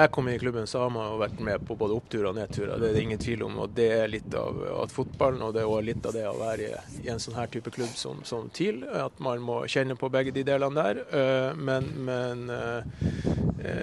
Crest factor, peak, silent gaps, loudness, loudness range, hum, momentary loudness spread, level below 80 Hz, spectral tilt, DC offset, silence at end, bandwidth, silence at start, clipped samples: 24 dB; -4 dBFS; none; -29 LUFS; 4 LU; none; 8 LU; -50 dBFS; -6 dB/octave; under 0.1%; 0 s; 12 kHz; 0 s; under 0.1%